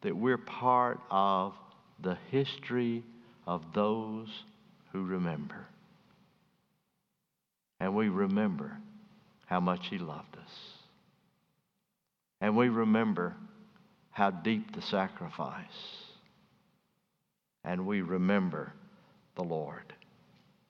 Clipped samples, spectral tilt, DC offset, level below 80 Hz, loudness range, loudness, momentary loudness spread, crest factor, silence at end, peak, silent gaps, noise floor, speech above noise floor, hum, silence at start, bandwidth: under 0.1%; -8 dB/octave; under 0.1%; -76 dBFS; 8 LU; -33 LUFS; 19 LU; 22 dB; 0.75 s; -12 dBFS; none; -86 dBFS; 54 dB; none; 0 s; 6.6 kHz